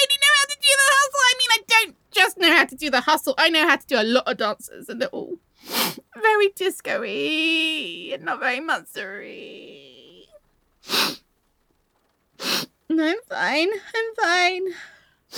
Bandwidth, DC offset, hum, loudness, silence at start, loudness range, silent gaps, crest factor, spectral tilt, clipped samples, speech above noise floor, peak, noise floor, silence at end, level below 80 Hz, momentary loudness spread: over 20 kHz; under 0.1%; none; -20 LUFS; 0 s; 12 LU; none; 20 dB; -0.5 dB/octave; under 0.1%; 44 dB; -2 dBFS; -68 dBFS; 0 s; -68 dBFS; 17 LU